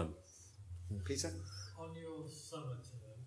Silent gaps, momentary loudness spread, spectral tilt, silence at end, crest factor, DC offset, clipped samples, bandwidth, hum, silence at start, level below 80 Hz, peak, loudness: none; 14 LU; -4.5 dB/octave; 0 s; 22 dB; under 0.1%; under 0.1%; 11 kHz; none; 0 s; -62 dBFS; -24 dBFS; -46 LUFS